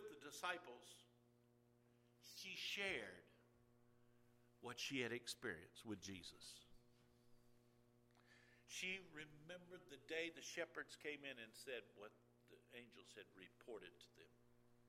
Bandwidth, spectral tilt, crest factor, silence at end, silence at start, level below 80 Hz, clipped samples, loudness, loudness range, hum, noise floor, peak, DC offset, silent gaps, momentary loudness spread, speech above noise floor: 16 kHz; -2.5 dB/octave; 24 dB; 0 s; 0 s; -84 dBFS; under 0.1%; -52 LUFS; 7 LU; none; -76 dBFS; -30 dBFS; under 0.1%; none; 17 LU; 23 dB